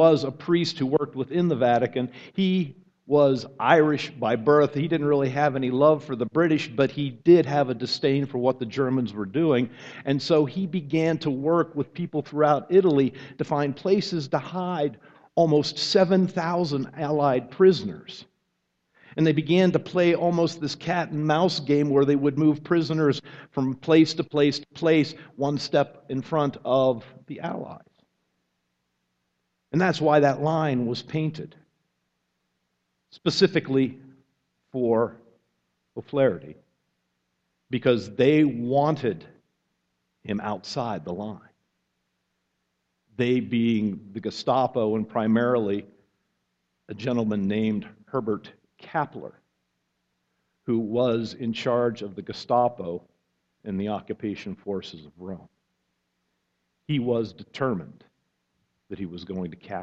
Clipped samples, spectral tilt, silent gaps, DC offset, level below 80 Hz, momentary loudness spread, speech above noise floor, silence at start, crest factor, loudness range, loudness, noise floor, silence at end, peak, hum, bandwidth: under 0.1%; -7 dB/octave; none; under 0.1%; -64 dBFS; 14 LU; 53 dB; 0 s; 24 dB; 9 LU; -24 LUFS; -77 dBFS; 0 s; -2 dBFS; none; 8.2 kHz